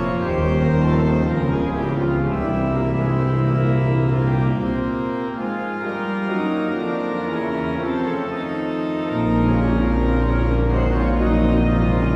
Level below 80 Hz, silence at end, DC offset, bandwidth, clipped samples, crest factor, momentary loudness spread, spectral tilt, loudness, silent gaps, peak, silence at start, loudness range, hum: -28 dBFS; 0 s; under 0.1%; 6.6 kHz; under 0.1%; 14 dB; 7 LU; -9.5 dB/octave; -20 LUFS; none; -6 dBFS; 0 s; 4 LU; none